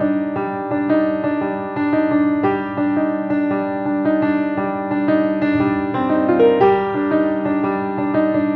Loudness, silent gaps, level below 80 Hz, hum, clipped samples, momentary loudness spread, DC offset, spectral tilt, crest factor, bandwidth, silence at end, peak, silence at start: -18 LUFS; none; -54 dBFS; none; under 0.1%; 6 LU; under 0.1%; -10 dB/octave; 14 dB; 4.7 kHz; 0 s; -2 dBFS; 0 s